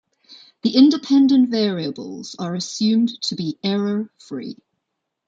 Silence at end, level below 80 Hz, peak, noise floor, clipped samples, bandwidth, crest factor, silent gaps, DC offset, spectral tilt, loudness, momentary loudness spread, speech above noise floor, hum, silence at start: 0.75 s; -68 dBFS; -2 dBFS; -78 dBFS; under 0.1%; 7.8 kHz; 18 dB; none; under 0.1%; -5.5 dB/octave; -19 LUFS; 17 LU; 59 dB; none; 0.3 s